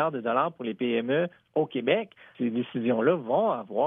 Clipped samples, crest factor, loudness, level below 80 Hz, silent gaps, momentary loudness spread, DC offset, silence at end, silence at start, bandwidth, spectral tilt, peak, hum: under 0.1%; 16 dB; -27 LUFS; -80 dBFS; none; 6 LU; under 0.1%; 0 s; 0 s; 3.8 kHz; -9.5 dB/octave; -10 dBFS; none